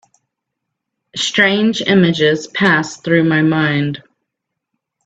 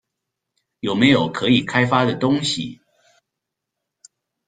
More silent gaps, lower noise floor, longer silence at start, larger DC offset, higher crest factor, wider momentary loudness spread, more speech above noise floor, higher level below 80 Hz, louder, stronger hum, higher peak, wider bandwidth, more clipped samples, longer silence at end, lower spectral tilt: neither; second, -78 dBFS vs -82 dBFS; first, 1.15 s vs 0.85 s; neither; about the same, 16 dB vs 20 dB; about the same, 8 LU vs 10 LU; about the same, 64 dB vs 64 dB; about the same, -56 dBFS vs -56 dBFS; first, -14 LUFS vs -18 LUFS; neither; about the same, 0 dBFS vs -2 dBFS; second, 8.4 kHz vs 9.4 kHz; neither; second, 1.05 s vs 1.75 s; about the same, -5 dB/octave vs -5 dB/octave